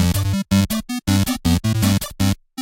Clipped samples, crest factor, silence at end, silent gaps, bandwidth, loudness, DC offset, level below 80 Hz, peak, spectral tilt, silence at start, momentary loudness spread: under 0.1%; 14 dB; 0 s; none; 17 kHz; -19 LUFS; under 0.1%; -34 dBFS; -4 dBFS; -5 dB/octave; 0 s; 4 LU